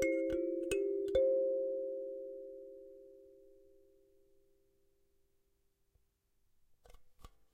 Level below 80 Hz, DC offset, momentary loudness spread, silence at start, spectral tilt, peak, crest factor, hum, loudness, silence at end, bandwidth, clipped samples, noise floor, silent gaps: -64 dBFS; under 0.1%; 22 LU; 0 s; -5 dB/octave; -20 dBFS; 20 dB; none; -36 LUFS; 0.25 s; 15 kHz; under 0.1%; -77 dBFS; none